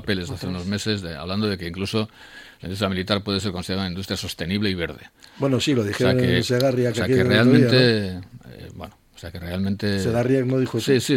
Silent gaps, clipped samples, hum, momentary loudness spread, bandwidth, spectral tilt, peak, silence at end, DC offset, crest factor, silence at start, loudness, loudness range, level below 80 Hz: none; under 0.1%; none; 21 LU; 16.5 kHz; -5.5 dB/octave; -2 dBFS; 0 s; under 0.1%; 20 dB; 0 s; -22 LUFS; 7 LU; -50 dBFS